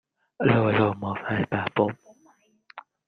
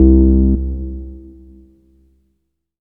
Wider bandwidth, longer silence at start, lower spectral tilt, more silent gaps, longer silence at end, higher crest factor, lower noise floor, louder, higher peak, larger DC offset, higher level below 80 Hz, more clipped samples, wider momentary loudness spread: first, 6.4 kHz vs 1.1 kHz; first, 0.4 s vs 0 s; second, -9 dB/octave vs -16 dB/octave; neither; second, 0.3 s vs 1.6 s; about the same, 20 dB vs 16 dB; second, -61 dBFS vs -70 dBFS; second, -25 LUFS vs -15 LUFS; second, -6 dBFS vs 0 dBFS; neither; second, -60 dBFS vs -18 dBFS; neither; second, 8 LU vs 24 LU